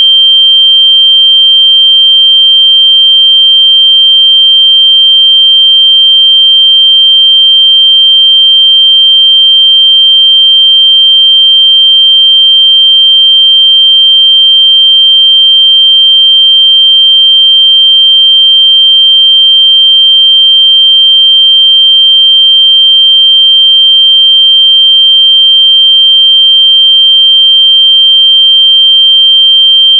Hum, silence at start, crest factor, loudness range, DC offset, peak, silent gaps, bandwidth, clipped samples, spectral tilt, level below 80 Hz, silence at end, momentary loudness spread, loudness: none; 0 s; 4 dB; 0 LU; under 0.1%; 0 dBFS; none; 3.4 kHz; 0.5%; 17.5 dB/octave; under -90 dBFS; 0 s; 0 LU; 0 LUFS